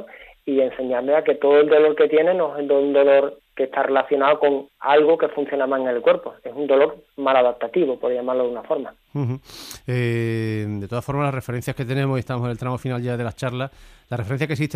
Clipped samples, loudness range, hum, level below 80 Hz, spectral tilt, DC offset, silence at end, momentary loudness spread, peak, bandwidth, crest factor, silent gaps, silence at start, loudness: under 0.1%; 8 LU; none; -54 dBFS; -7 dB/octave; under 0.1%; 0 s; 12 LU; -4 dBFS; 15 kHz; 16 dB; none; 0 s; -21 LUFS